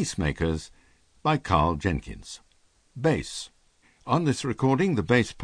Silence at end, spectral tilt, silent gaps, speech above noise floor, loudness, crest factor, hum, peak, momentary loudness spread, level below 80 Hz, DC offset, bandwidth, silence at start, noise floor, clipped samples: 0 s; -6 dB/octave; none; 38 dB; -26 LUFS; 22 dB; none; -6 dBFS; 20 LU; -42 dBFS; under 0.1%; 10 kHz; 0 s; -63 dBFS; under 0.1%